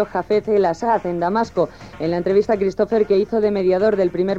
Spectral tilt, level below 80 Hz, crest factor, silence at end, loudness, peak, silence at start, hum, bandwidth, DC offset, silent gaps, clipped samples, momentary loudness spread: -7.5 dB/octave; -48 dBFS; 14 dB; 0 s; -19 LUFS; -6 dBFS; 0 s; none; 7.8 kHz; 0.2%; none; under 0.1%; 5 LU